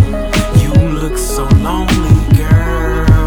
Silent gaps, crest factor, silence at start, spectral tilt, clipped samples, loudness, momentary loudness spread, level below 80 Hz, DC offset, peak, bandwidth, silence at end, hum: none; 10 dB; 0 s; -6.5 dB/octave; 0.6%; -12 LUFS; 6 LU; -16 dBFS; under 0.1%; 0 dBFS; 17.5 kHz; 0 s; none